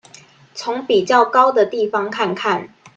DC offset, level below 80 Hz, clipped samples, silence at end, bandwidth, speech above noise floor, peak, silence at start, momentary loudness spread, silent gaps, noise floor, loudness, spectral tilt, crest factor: under 0.1%; -66 dBFS; under 0.1%; 0.1 s; 8.8 kHz; 29 dB; 0 dBFS; 0.55 s; 11 LU; none; -46 dBFS; -17 LUFS; -4 dB/octave; 18 dB